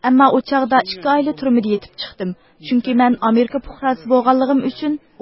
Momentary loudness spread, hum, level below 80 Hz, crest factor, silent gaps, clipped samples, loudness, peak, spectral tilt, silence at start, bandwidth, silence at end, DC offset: 12 LU; none; -50 dBFS; 16 dB; none; under 0.1%; -17 LUFS; 0 dBFS; -10 dB/octave; 0.05 s; 5.8 kHz; 0.25 s; under 0.1%